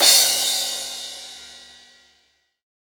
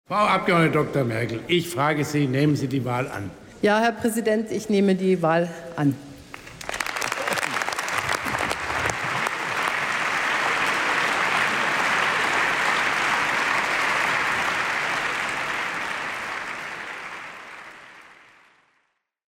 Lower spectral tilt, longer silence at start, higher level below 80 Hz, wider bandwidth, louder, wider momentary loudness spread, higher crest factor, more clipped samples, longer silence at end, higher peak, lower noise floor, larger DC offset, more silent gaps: second, 2.5 dB/octave vs -4.5 dB/octave; about the same, 0 s vs 0.1 s; second, -66 dBFS vs -56 dBFS; about the same, 19.5 kHz vs 18 kHz; first, -18 LUFS vs -23 LUFS; first, 25 LU vs 12 LU; first, 24 dB vs 18 dB; neither; about the same, 1.35 s vs 1.25 s; first, 0 dBFS vs -6 dBFS; second, -64 dBFS vs -71 dBFS; neither; neither